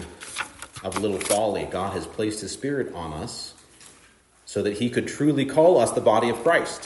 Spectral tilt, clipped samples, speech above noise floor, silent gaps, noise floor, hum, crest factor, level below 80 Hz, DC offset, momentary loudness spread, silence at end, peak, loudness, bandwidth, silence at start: -4.5 dB/octave; under 0.1%; 33 dB; none; -56 dBFS; none; 18 dB; -56 dBFS; under 0.1%; 14 LU; 0 s; -6 dBFS; -24 LUFS; 11.5 kHz; 0 s